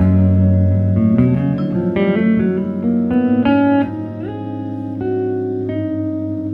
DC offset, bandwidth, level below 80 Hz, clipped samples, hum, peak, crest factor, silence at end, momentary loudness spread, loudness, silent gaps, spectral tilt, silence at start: under 0.1%; 4.2 kHz; -42 dBFS; under 0.1%; none; -2 dBFS; 14 dB; 0 s; 11 LU; -17 LUFS; none; -11 dB/octave; 0 s